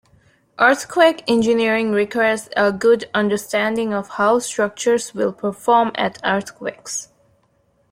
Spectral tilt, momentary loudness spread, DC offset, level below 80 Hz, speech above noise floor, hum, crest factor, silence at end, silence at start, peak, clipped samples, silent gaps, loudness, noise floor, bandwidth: -4 dB/octave; 8 LU; under 0.1%; -62 dBFS; 43 dB; none; 18 dB; 0.85 s; 0.6 s; -2 dBFS; under 0.1%; none; -18 LUFS; -62 dBFS; 16 kHz